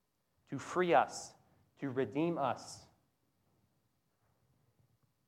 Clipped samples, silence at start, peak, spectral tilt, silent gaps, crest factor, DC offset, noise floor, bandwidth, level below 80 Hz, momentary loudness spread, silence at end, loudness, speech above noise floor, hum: under 0.1%; 0.5 s; -16 dBFS; -5.5 dB/octave; none; 24 dB; under 0.1%; -79 dBFS; 13.5 kHz; -82 dBFS; 20 LU; 2.45 s; -35 LUFS; 45 dB; none